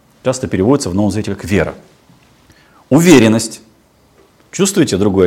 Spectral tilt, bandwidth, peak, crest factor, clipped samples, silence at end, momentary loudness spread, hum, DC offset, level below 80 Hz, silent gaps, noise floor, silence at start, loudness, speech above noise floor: -5.5 dB/octave; 17 kHz; 0 dBFS; 14 dB; 0.7%; 0 s; 14 LU; none; under 0.1%; -46 dBFS; none; -50 dBFS; 0.25 s; -13 LUFS; 38 dB